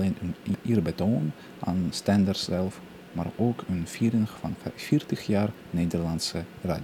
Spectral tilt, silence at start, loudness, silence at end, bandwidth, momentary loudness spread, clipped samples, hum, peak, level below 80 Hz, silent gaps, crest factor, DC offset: -6.5 dB/octave; 0 s; -28 LUFS; 0 s; 17.5 kHz; 9 LU; under 0.1%; none; -10 dBFS; -56 dBFS; none; 18 dB; under 0.1%